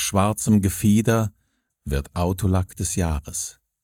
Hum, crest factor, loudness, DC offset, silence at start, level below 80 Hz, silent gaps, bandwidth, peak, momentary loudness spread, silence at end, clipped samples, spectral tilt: none; 18 dB; -22 LUFS; under 0.1%; 0 s; -38 dBFS; none; 17 kHz; -4 dBFS; 10 LU; 0.3 s; under 0.1%; -5.5 dB/octave